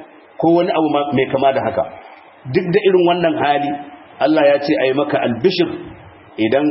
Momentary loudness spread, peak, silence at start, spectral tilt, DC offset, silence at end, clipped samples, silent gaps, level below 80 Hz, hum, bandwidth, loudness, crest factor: 13 LU; -2 dBFS; 0 s; -10 dB/octave; under 0.1%; 0 s; under 0.1%; none; -56 dBFS; none; 5.8 kHz; -16 LUFS; 14 dB